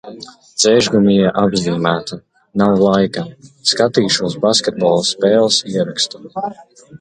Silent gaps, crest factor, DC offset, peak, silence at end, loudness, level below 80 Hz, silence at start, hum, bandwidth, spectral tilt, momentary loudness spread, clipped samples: none; 16 dB; under 0.1%; 0 dBFS; 0.05 s; -15 LUFS; -52 dBFS; 0.05 s; none; 10.5 kHz; -4 dB/octave; 15 LU; under 0.1%